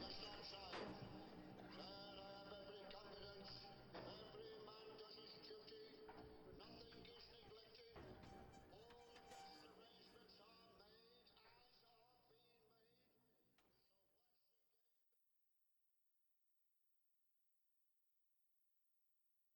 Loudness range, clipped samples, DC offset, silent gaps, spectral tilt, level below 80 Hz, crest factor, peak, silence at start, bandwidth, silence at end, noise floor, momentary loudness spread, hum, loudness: 9 LU; under 0.1%; under 0.1%; none; -5 dB/octave; -78 dBFS; 22 dB; -40 dBFS; 0 s; 19 kHz; 0 s; -85 dBFS; 12 LU; none; -60 LUFS